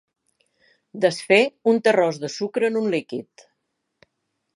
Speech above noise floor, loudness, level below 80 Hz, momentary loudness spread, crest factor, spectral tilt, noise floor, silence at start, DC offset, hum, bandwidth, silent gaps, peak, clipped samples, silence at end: 56 dB; -21 LUFS; -78 dBFS; 14 LU; 20 dB; -4.5 dB/octave; -76 dBFS; 0.95 s; under 0.1%; none; 11.5 kHz; none; -4 dBFS; under 0.1%; 1.35 s